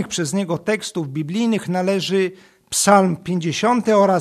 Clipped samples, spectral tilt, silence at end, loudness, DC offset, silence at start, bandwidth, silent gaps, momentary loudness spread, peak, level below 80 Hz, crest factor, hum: under 0.1%; -4.5 dB/octave; 0 s; -19 LUFS; under 0.1%; 0 s; 14 kHz; none; 9 LU; 0 dBFS; -60 dBFS; 18 dB; none